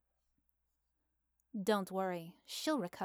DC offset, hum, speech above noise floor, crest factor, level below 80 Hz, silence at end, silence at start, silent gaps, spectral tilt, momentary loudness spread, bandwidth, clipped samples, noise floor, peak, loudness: under 0.1%; none; 44 dB; 20 dB; -84 dBFS; 0 s; 1.55 s; none; -4.5 dB/octave; 10 LU; over 20 kHz; under 0.1%; -82 dBFS; -22 dBFS; -38 LUFS